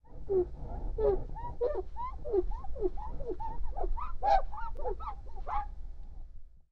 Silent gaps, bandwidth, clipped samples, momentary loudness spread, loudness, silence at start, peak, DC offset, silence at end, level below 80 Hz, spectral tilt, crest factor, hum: none; 5.8 kHz; under 0.1%; 15 LU; -36 LUFS; 0.05 s; -14 dBFS; under 0.1%; 0.1 s; -38 dBFS; -8.5 dB/octave; 18 dB; none